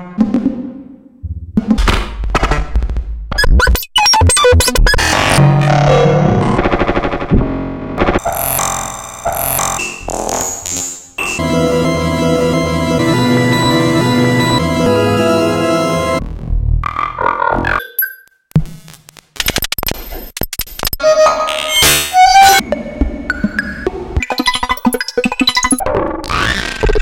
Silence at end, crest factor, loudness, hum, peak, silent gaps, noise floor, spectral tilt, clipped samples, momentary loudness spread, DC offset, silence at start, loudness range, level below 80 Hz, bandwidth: 0 s; 14 dB; -13 LUFS; none; 0 dBFS; none; -39 dBFS; -4 dB/octave; under 0.1%; 12 LU; under 0.1%; 0 s; 7 LU; -22 dBFS; 17 kHz